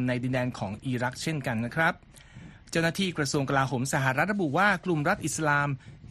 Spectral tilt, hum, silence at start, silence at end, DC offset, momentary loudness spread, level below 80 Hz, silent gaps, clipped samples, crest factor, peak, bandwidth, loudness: -5 dB/octave; none; 0 s; 0 s; under 0.1%; 8 LU; -56 dBFS; none; under 0.1%; 18 dB; -10 dBFS; 13 kHz; -27 LUFS